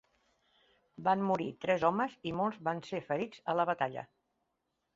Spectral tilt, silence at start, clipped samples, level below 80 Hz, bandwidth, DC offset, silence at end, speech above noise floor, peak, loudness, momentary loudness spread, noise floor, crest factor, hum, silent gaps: -4.5 dB/octave; 1 s; under 0.1%; -72 dBFS; 7.6 kHz; under 0.1%; 0.9 s; 50 dB; -14 dBFS; -34 LUFS; 7 LU; -83 dBFS; 20 dB; none; none